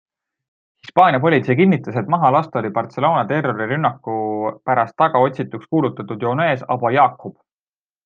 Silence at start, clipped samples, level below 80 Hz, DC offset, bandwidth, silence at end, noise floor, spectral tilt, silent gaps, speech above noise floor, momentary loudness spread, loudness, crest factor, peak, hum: 0.85 s; under 0.1%; -64 dBFS; under 0.1%; 7 kHz; 0.75 s; under -90 dBFS; -9 dB/octave; none; over 73 dB; 9 LU; -18 LUFS; 18 dB; 0 dBFS; none